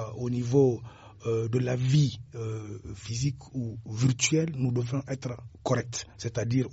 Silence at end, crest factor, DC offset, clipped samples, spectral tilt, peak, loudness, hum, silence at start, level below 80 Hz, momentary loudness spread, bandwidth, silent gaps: 0 s; 18 dB; under 0.1%; under 0.1%; -6.5 dB/octave; -10 dBFS; -29 LUFS; none; 0 s; -56 dBFS; 13 LU; 8 kHz; none